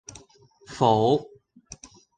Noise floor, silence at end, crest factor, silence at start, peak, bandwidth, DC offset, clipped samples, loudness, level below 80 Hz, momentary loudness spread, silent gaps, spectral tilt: -56 dBFS; 0.95 s; 22 dB; 0.7 s; -4 dBFS; 9.6 kHz; under 0.1%; under 0.1%; -22 LUFS; -58 dBFS; 25 LU; none; -6 dB/octave